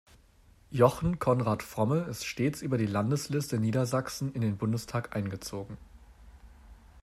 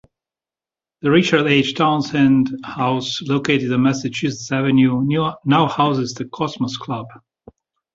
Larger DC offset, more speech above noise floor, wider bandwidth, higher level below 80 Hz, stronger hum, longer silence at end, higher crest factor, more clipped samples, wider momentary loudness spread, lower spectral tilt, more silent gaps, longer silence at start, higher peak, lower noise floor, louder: neither; second, 30 dB vs over 72 dB; first, 15 kHz vs 7.8 kHz; about the same, -54 dBFS vs -56 dBFS; neither; second, 0 s vs 0.8 s; first, 22 dB vs 16 dB; neither; about the same, 12 LU vs 10 LU; about the same, -6.5 dB/octave vs -6 dB/octave; neither; second, 0.7 s vs 1.05 s; second, -8 dBFS vs -2 dBFS; second, -60 dBFS vs under -90 dBFS; second, -30 LUFS vs -18 LUFS